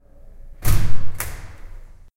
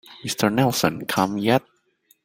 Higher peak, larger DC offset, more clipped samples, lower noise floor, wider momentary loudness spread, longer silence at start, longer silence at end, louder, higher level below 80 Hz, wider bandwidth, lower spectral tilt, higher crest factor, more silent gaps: about the same, -2 dBFS vs -2 dBFS; neither; neither; second, -40 dBFS vs -62 dBFS; first, 23 LU vs 4 LU; first, 0.65 s vs 0.1 s; second, 0.5 s vs 0.65 s; second, -26 LUFS vs -22 LUFS; first, -26 dBFS vs -58 dBFS; about the same, 17 kHz vs 17 kHz; about the same, -4.5 dB/octave vs -4.5 dB/octave; second, 12 dB vs 20 dB; neither